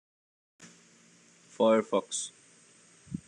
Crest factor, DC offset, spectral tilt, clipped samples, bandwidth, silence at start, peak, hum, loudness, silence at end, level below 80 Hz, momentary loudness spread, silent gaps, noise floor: 20 dB; under 0.1%; -4 dB/octave; under 0.1%; 10.5 kHz; 0.6 s; -14 dBFS; none; -29 LUFS; 0.1 s; -74 dBFS; 16 LU; none; -60 dBFS